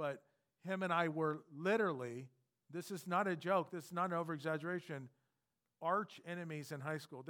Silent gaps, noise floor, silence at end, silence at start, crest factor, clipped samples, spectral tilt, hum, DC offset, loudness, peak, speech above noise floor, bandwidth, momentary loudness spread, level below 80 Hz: none; -89 dBFS; 0 s; 0 s; 20 dB; under 0.1%; -6 dB/octave; none; under 0.1%; -40 LUFS; -20 dBFS; 49 dB; 18 kHz; 14 LU; under -90 dBFS